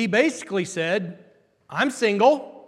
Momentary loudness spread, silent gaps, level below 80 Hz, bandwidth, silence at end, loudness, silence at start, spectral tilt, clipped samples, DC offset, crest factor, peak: 9 LU; none; -74 dBFS; 13 kHz; 0.05 s; -22 LUFS; 0 s; -4.5 dB/octave; under 0.1%; under 0.1%; 18 dB; -6 dBFS